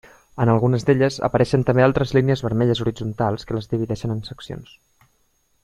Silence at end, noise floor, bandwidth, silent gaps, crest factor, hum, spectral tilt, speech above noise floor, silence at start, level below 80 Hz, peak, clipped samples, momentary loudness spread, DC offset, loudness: 1 s; -65 dBFS; 10.5 kHz; none; 18 dB; none; -7.5 dB/octave; 45 dB; 0.35 s; -46 dBFS; -2 dBFS; under 0.1%; 15 LU; under 0.1%; -20 LUFS